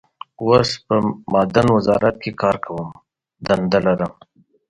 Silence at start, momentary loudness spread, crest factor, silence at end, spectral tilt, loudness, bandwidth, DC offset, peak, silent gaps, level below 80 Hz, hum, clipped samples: 0.4 s; 12 LU; 18 dB; 0.55 s; -6.5 dB/octave; -18 LUFS; 11 kHz; under 0.1%; 0 dBFS; none; -48 dBFS; none; under 0.1%